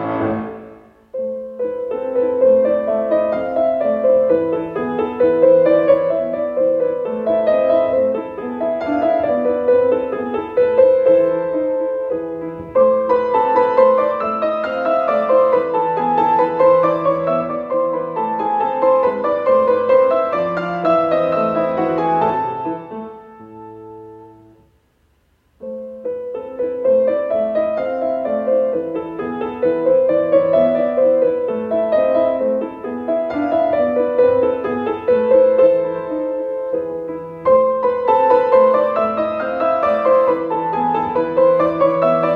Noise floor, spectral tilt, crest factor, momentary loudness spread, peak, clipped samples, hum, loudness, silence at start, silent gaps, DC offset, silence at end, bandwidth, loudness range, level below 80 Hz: -59 dBFS; -8.5 dB/octave; 14 dB; 11 LU; -2 dBFS; under 0.1%; none; -17 LUFS; 0 s; none; under 0.1%; 0 s; 4.7 kHz; 5 LU; -54 dBFS